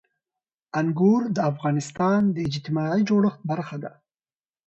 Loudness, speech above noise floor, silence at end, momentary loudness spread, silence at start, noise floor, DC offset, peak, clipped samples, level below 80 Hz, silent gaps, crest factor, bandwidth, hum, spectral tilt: -23 LUFS; over 67 dB; 0.8 s; 10 LU; 0.75 s; under -90 dBFS; under 0.1%; -8 dBFS; under 0.1%; -64 dBFS; none; 16 dB; 8.2 kHz; none; -7.5 dB/octave